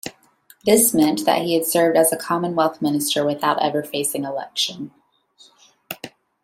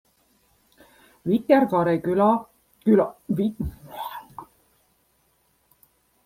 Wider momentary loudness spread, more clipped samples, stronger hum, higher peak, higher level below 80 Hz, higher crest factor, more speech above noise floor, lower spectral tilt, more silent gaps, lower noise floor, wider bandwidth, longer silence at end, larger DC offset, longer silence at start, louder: about the same, 18 LU vs 17 LU; neither; neither; about the same, -2 dBFS vs -4 dBFS; second, -64 dBFS vs -50 dBFS; about the same, 18 dB vs 20 dB; second, 35 dB vs 46 dB; second, -3 dB/octave vs -8.5 dB/octave; neither; second, -54 dBFS vs -66 dBFS; about the same, 16.5 kHz vs 16 kHz; second, 0.35 s vs 1.85 s; neither; second, 0.05 s vs 1.25 s; first, -19 LUFS vs -23 LUFS